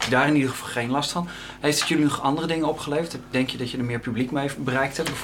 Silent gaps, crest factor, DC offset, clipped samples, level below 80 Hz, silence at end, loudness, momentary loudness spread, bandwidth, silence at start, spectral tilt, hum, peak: none; 18 dB; under 0.1%; under 0.1%; -52 dBFS; 0 s; -24 LUFS; 7 LU; 17 kHz; 0 s; -4.5 dB/octave; none; -6 dBFS